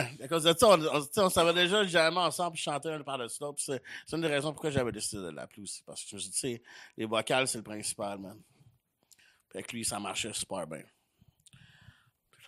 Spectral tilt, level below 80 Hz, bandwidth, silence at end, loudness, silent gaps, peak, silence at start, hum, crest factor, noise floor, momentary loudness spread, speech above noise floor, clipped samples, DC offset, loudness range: -3 dB/octave; -64 dBFS; 15.5 kHz; 0 s; -30 LUFS; none; -8 dBFS; 0 s; none; 24 dB; -68 dBFS; 17 LU; 37 dB; under 0.1%; under 0.1%; 12 LU